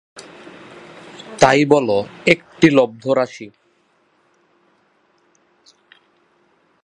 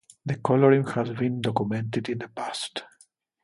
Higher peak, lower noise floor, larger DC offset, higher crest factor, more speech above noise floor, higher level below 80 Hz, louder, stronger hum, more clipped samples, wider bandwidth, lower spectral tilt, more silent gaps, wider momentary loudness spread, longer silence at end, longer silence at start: first, 0 dBFS vs -6 dBFS; about the same, -60 dBFS vs -61 dBFS; neither; about the same, 20 dB vs 20 dB; first, 45 dB vs 36 dB; first, -58 dBFS vs -64 dBFS; first, -16 LUFS vs -26 LUFS; neither; neither; about the same, 11 kHz vs 11.5 kHz; second, -5 dB/octave vs -6.5 dB/octave; neither; first, 26 LU vs 13 LU; first, 3.35 s vs 0.6 s; about the same, 0.2 s vs 0.25 s